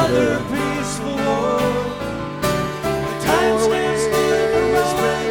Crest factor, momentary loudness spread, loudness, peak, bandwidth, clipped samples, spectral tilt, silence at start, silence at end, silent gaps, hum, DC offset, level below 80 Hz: 16 dB; 6 LU; -19 LUFS; -4 dBFS; 18 kHz; under 0.1%; -4.5 dB/octave; 0 s; 0 s; none; none; under 0.1%; -40 dBFS